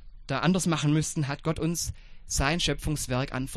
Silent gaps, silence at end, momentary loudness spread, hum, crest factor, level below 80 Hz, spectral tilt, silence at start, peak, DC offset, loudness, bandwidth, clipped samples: none; 0 s; 7 LU; none; 20 dB; -40 dBFS; -4.5 dB/octave; 0 s; -8 dBFS; under 0.1%; -28 LUFS; 13.5 kHz; under 0.1%